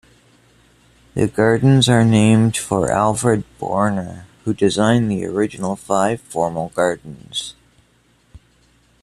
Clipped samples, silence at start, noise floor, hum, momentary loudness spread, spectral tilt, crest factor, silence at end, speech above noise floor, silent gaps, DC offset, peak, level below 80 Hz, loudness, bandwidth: under 0.1%; 1.15 s; -57 dBFS; none; 13 LU; -5.5 dB/octave; 18 dB; 0.65 s; 40 dB; none; under 0.1%; -2 dBFS; -50 dBFS; -18 LUFS; 13.5 kHz